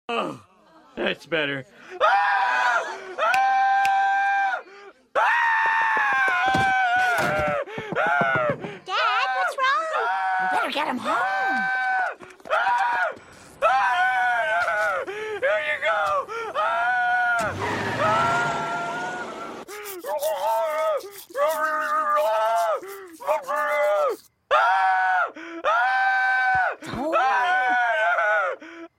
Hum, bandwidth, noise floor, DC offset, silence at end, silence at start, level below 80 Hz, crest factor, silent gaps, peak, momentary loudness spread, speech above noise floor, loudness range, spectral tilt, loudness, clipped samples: none; 16.5 kHz; -54 dBFS; under 0.1%; 0.1 s; 0.1 s; -60 dBFS; 16 dB; none; -6 dBFS; 10 LU; 28 dB; 3 LU; -3.5 dB/octave; -22 LUFS; under 0.1%